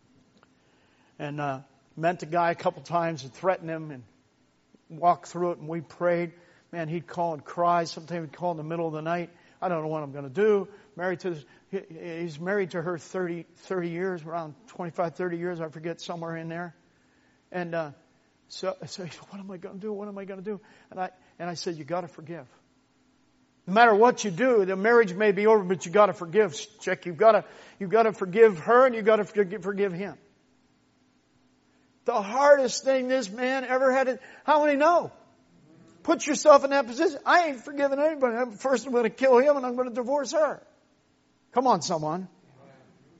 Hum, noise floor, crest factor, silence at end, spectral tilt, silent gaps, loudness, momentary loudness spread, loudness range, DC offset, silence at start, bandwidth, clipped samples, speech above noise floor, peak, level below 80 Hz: none; -66 dBFS; 22 dB; 0.95 s; -4 dB/octave; none; -26 LUFS; 17 LU; 13 LU; under 0.1%; 1.2 s; 8 kHz; under 0.1%; 40 dB; -4 dBFS; -76 dBFS